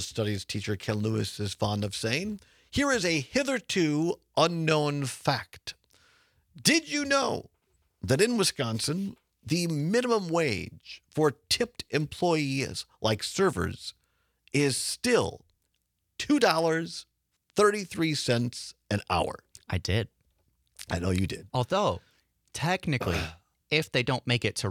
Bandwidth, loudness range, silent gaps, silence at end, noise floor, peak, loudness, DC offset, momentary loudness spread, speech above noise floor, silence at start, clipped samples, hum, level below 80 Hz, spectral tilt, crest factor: 18.5 kHz; 3 LU; none; 0 s; -78 dBFS; -6 dBFS; -28 LUFS; under 0.1%; 13 LU; 50 dB; 0 s; under 0.1%; none; -58 dBFS; -4.5 dB/octave; 22 dB